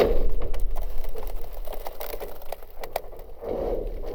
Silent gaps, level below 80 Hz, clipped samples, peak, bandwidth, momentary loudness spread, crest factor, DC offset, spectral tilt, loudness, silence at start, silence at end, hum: none; -28 dBFS; under 0.1%; -6 dBFS; 19 kHz; 10 LU; 16 dB; under 0.1%; -6 dB/octave; -34 LUFS; 0 s; 0 s; none